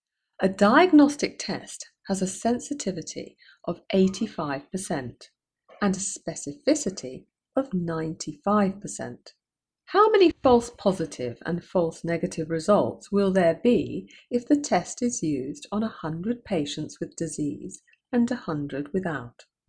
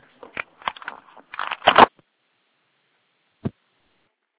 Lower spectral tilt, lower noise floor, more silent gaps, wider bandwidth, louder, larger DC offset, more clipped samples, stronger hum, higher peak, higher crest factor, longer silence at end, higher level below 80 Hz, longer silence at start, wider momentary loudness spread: first, -5 dB/octave vs -1 dB/octave; first, -73 dBFS vs -69 dBFS; neither; first, 11 kHz vs 4 kHz; second, -25 LUFS vs -19 LUFS; neither; neither; neither; second, -6 dBFS vs 0 dBFS; about the same, 20 dB vs 24 dB; second, 0.4 s vs 0.9 s; about the same, -58 dBFS vs -56 dBFS; about the same, 0.4 s vs 0.35 s; second, 16 LU vs 23 LU